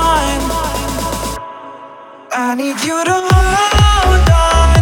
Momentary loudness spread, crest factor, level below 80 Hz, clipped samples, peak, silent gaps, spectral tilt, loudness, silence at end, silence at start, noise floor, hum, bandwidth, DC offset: 16 LU; 12 dB; -16 dBFS; under 0.1%; 0 dBFS; none; -4.5 dB/octave; -13 LUFS; 0 s; 0 s; -35 dBFS; none; 18.5 kHz; under 0.1%